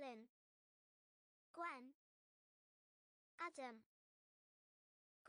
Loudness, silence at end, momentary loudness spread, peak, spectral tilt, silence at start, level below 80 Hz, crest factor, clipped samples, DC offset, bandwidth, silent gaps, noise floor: -54 LUFS; 0 s; 14 LU; -38 dBFS; -3 dB/octave; 0 s; under -90 dBFS; 22 dB; under 0.1%; under 0.1%; 10 kHz; 0.29-1.54 s, 1.95-3.38 s, 3.86-5.25 s; under -90 dBFS